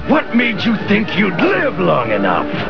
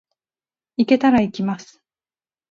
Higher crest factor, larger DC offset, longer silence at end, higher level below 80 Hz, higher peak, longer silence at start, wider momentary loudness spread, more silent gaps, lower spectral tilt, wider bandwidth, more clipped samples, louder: about the same, 16 dB vs 20 dB; first, 4% vs under 0.1%; second, 0 s vs 0.85 s; first, -42 dBFS vs -54 dBFS; about the same, 0 dBFS vs -2 dBFS; second, 0 s vs 0.8 s; second, 2 LU vs 16 LU; neither; about the same, -7.5 dB/octave vs -6.5 dB/octave; second, 5.4 kHz vs 7.4 kHz; neither; first, -15 LUFS vs -18 LUFS